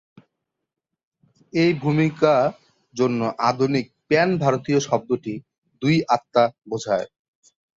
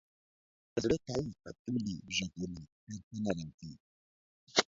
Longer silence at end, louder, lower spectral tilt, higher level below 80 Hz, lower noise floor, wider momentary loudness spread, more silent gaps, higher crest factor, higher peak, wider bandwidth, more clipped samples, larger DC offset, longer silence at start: first, 0.7 s vs 0.05 s; first, -21 LUFS vs -37 LUFS; first, -6 dB/octave vs -4 dB/octave; about the same, -62 dBFS vs -62 dBFS; second, -83 dBFS vs under -90 dBFS; second, 9 LU vs 15 LU; second, 5.58-5.62 s vs 1.59-1.65 s, 2.72-2.87 s, 3.04-3.11 s, 3.54-3.58 s, 3.80-4.47 s; second, 20 dB vs 28 dB; first, -4 dBFS vs -10 dBFS; about the same, 7.8 kHz vs 7.6 kHz; neither; neither; first, 1.55 s vs 0.75 s